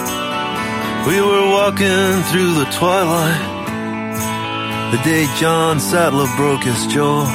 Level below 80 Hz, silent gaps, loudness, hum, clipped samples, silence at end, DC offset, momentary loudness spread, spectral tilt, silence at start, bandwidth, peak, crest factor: -48 dBFS; none; -16 LUFS; none; under 0.1%; 0 s; under 0.1%; 7 LU; -4.5 dB/octave; 0 s; 16.5 kHz; -4 dBFS; 12 dB